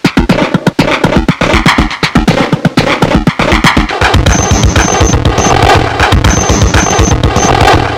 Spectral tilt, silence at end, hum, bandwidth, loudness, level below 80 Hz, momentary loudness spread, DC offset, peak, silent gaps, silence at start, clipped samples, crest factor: -4.5 dB/octave; 0 s; none; 17 kHz; -8 LUFS; -16 dBFS; 3 LU; 0.1%; 0 dBFS; none; 0.05 s; 3%; 8 dB